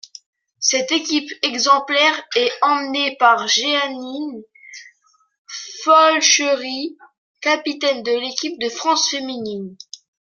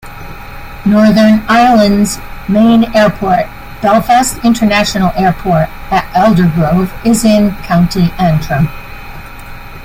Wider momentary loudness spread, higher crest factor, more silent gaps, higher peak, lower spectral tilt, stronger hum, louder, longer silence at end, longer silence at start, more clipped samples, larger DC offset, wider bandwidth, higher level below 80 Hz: second, 18 LU vs 21 LU; first, 18 dB vs 10 dB; first, 5.38-5.45 s, 7.18-7.34 s vs none; about the same, 0 dBFS vs 0 dBFS; second, -0.5 dB/octave vs -6 dB/octave; neither; second, -17 LUFS vs -10 LUFS; first, 0.6 s vs 0 s; first, 0.6 s vs 0.05 s; neither; neither; second, 11 kHz vs 16.5 kHz; second, -74 dBFS vs -28 dBFS